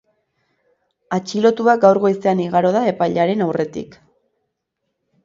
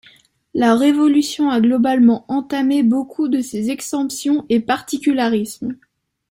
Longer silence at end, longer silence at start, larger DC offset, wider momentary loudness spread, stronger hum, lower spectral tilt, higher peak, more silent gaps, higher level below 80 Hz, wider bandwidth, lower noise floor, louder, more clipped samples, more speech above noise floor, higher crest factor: first, 1.4 s vs 0.55 s; first, 1.1 s vs 0.55 s; neither; first, 12 LU vs 9 LU; neither; first, -6.5 dB/octave vs -4.5 dB/octave; about the same, 0 dBFS vs -2 dBFS; neither; about the same, -62 dBFS vs -60 dBFS; second, 7.6 kHz vs 16.5 kHz; first, -75 dBFS vs -51 dBFS; about the same, -17 LUFS vs -17 LUFS; neither; first, 59 dB vs 35 dB; about the same, 18 dB vs 14 dB